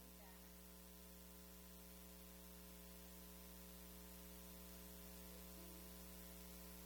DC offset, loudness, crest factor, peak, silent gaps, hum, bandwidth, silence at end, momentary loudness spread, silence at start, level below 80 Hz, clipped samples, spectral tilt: under 0.1%; -58 LUFS; 16 dB; -42 dBFS; none; none; 19.5 kHz; 0 s; 3 LU; 0 s; -66 dBFS; under 0.1%; -3.5 dB/octave